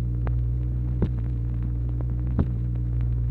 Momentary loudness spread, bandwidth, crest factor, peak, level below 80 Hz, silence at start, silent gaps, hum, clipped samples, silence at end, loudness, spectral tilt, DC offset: 2 LU; 2.9 kHz; 16 dB; -8 dBFS; -28 dBFS; 0 s; none; none; under 0.1%; 0 s; -27 LUFS; -11.5 dB/octave; under 0.1%